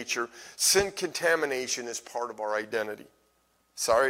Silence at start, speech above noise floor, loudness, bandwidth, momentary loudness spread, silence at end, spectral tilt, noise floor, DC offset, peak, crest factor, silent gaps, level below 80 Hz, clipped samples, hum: 0 s; 41 dB; -28 LUFS; 18 kHz; 14 LU; 0 s; -1 dB/octave; -69 dBFS; under 0.1%; -8 dBFS; 20 dB; none; -60 dBFS; under 0.1%; none